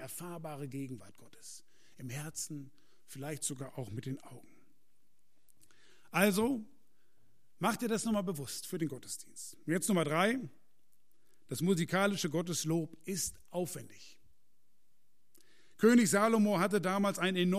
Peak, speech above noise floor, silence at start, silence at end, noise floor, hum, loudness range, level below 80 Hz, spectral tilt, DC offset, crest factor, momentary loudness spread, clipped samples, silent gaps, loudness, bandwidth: -14 dBFS; 47 dB; 0 s; 0 s; -81 dBFS; none; 11 LU; -70 dBFS; -4.5 dB/octave; 0.2%; 20 dB; 18 LU; under 0.1%; none; -34 LUFS; 15.5 kHz